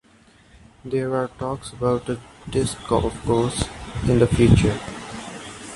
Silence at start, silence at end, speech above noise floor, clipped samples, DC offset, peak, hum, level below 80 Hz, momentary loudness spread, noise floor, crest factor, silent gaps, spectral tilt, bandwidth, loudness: 0.85 s; 0 s; 32 dB; under 0.1%; under 0.1%; -2 dBFS; none; -36 dBFS; 18 LU; -53 dBFS; 20 dB; none; -6.5 dB/octave; 11.5 kHz; -22 LUFS